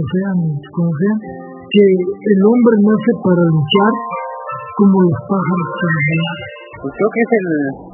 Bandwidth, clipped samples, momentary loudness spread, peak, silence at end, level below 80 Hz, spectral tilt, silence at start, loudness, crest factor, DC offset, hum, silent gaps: 3.2 kHz; under 0.1%; 14 LU; 0 dBFS; 0 s; -56 dBFS; -11.5 dB/octave; 0 s; -14 LUFS; 14 dB; under 0.1%; none; none